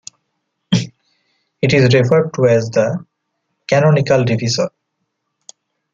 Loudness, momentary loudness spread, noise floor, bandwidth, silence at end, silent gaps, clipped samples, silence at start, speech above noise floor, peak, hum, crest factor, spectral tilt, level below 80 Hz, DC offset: -15 LUFS; 10 LU; -72 dBFS; 7.6 kHz; 1.25 s; none; under 0.1%; 0.7 s; 59 dB; -2 dBFS; none; 16 dB; -6 dB/octave; -54 dBFS; under 0.1%